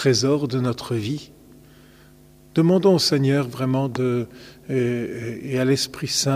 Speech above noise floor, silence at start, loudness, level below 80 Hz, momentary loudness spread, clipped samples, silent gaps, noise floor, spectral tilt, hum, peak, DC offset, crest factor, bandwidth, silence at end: 29 dB; 0 s; -22 LUFS; -56 dBFS; 12 LU; under 0.1%; none; -50 dBFS; -5 dB/octave; none; -6 dBFS; under 0.1%; 16 dB; 15.5 kHz; 0 s